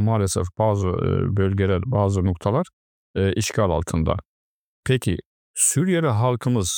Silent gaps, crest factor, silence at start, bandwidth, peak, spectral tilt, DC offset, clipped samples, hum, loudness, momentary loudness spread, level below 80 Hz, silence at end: 2.73-3.14 s, 4.25-4.83 s, 5.26-5.54 s; 16 dB; 0 s; 19 kHz; -4 dBFS; -5.5 dB/octave; under 0.1%; under 0.1%; none; -22 LUFS; 8 LU; -44 dBFS; 0 s